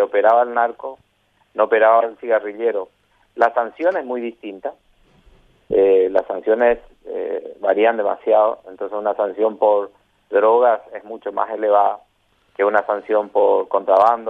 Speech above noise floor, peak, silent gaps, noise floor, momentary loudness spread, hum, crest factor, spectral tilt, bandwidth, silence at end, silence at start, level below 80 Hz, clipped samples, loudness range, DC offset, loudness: 42 dB; -2 dBFS; none; -59 dBFS; 16 LU; none; 16 dB; -6.5 dB/octave; 5 kHz; 0 s; 0 s; -58 dBFS; under 0.1%; 3 LU; under 0.1%; -18 LUFS